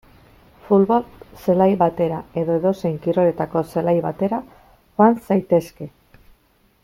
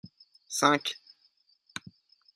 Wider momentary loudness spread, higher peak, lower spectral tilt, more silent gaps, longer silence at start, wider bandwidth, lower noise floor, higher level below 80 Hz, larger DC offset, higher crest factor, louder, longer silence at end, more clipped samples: second, 12 LU vs 19 LU; first, -2 dBFS vs -6 dBFS; first, -9 dB/octave vs -2.5 dB/octave; neither; first, 0.65 s vs 0.05 s; about the same, 16 kHz vs 15 kHz; second, -59 dBFS vs -68 dBFS; first, -54 dBFS vs -80 dBFS; neither; second, 18 dB vs 28 dB; first, -19 LUFS vs -27 LUFS; second, 0.95 s vs 1.4 s; neither